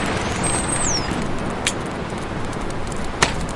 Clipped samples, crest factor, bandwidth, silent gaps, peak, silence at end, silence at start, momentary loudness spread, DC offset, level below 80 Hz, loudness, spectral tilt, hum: under 0.1%; 22 dB; 11.5 kHz; none; 0 dBFS; 0 s; 0 s; 8 LU; 0.5%; -32 dBFS; -23 LUFS; -3.5 dB/octave; none